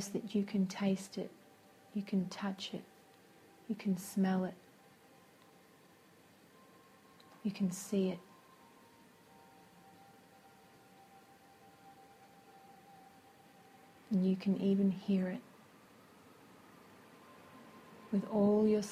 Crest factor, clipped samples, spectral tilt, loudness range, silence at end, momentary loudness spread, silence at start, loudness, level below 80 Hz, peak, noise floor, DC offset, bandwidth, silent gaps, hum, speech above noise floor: 18 dB; under 0.1%; -6.5 dB/octave; 23 LU; 0 s; 27 LU; 0 s; -36 LUFS; -80 dBFS; -20 dBFS; -63 dBFS; under 0.1%; 15 kHz; none; none; 29 dB